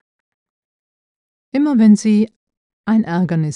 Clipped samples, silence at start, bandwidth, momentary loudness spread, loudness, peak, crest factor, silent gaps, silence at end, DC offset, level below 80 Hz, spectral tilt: under 0.1%; 1.55 s; 10.5 kHz; 12 LU; -15 LUFS; -2 dBFS; 14 dB; 2.36-2.47 s, 2.57-2.84 s; 0 s; under 0.1%; -64 dBFS; -7.5 dB/octave